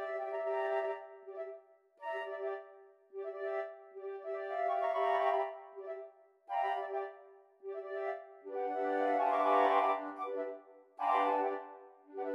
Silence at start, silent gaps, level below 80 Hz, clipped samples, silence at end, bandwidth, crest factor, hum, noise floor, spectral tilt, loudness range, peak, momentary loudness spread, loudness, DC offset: 0 s; none; under -90 dBFS; under 0.1%; 0 s; 6.8 kHz; 20 dB; none; -59 dBFS; -4 dB/octave; 9 LU; -18 dBFS; 17 LU; -36 LUFS; under 0.1%